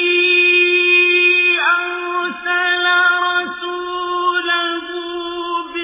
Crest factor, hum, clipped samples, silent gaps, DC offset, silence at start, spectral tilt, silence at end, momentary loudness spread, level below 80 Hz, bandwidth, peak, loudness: 14 dB; none; under 0.1%; none; under 0.1%; 0 s; -5 dB/octave; 0 s; 13 LU; -60 dBFS; 3.9 kHz; -2 dBFS; -14 LUFS